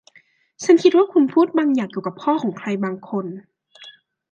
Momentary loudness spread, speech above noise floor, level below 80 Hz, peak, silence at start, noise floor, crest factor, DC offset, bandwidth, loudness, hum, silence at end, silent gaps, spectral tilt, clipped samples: 13 LU; 38 dB; -72 dBFS; -2 dBFS; 0.6 s; -56 dBFS; 18 dB; under 0.1%; 8.6 kHz; -19 LUFS; none; 0.4 s; none; -6 dB/octave; under 0.1%